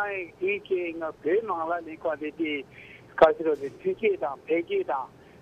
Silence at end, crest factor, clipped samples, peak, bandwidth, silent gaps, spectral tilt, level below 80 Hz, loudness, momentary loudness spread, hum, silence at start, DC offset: 0.35 s; 24 dB; under 0.1%; -4 dBFS; 8.4 kHz; none; -6.5 dB/octave; -62 dBFS; -28 LUFS; 12 LU; none; 0 s; under 0.1%